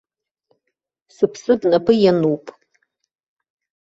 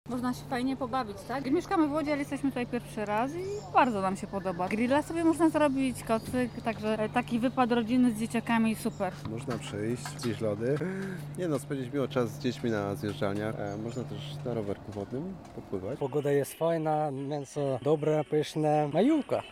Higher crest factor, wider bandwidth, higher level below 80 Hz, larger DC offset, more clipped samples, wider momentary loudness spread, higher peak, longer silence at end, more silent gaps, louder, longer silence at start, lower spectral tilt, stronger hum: about the same, 18 dB vs 18 dB; second, 7.8 kHz vs 16 kHz; about the same, -60 dBFS vs -58 dBFS; neither; neither; about the same, 8 LU vs 10 LU; first, -2 dBFS vs -12 dBFS; first, 1.3 s vs 0 s; neither; first, -17 LUFS vs -30 LUFS; first, 1.2 s vs 0.05 s; about the same, -7 dB/octave vs -6.5 dB/octave; neither